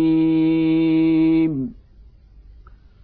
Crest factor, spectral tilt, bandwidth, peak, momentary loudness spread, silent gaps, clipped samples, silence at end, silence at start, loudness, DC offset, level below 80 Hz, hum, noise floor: 10 dB; -11.5 dB/octave; 4.4 kHz; -10 dBFS; 8 LU; none; under 0.1%; 1.3 s; 0 s; -18 LUFS; under 0.1%; -46 dBFS; none; -47 dBFS